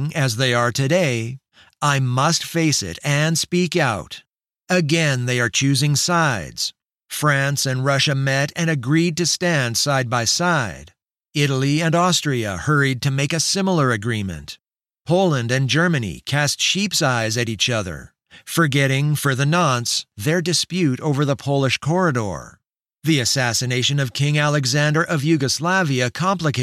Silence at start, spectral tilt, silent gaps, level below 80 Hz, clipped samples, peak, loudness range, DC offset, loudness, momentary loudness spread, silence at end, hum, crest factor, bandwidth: 0 s; -4 dB/octave; none; -52 dBFS; under 0.1%; -4 dBFS; 1 LU; under 0.1%; -19 LUFS; 7 LU; 0 s; none; 14 dB; 15 kHz